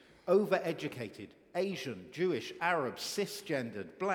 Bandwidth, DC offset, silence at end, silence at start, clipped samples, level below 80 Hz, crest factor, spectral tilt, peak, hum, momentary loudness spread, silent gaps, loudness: 18.5 kHz; under 0.1%; 0 s; 0.25 s; under 0.1%; -78 dBFS; 20 dB; -4.5 dB/octave; -14 dBFS; none; 12 LU; none; -35 LUFS